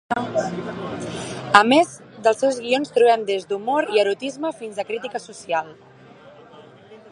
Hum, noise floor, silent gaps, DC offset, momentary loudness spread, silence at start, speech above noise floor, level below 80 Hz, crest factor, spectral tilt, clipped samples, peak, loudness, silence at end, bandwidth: none; -46 dBFS; none; under 0.1%; 14 LU; 0.1 s; 25 dB; -62 dBFS; 22 dB; -4 dB/octave; under 0.1%; 0 dBFS; -21 LUFS; 0.15 s; 11.5 kHz